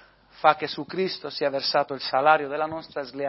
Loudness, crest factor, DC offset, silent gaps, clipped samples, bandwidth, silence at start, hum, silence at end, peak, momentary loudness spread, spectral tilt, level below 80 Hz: -25 LUFS; 22 dB; under 0.1%; none; under 0.1%; 6 kHz; 0.4 s; none; 0 s; -4 dBFS; 10 LU; -7.5 dB/octave; -68 dBFS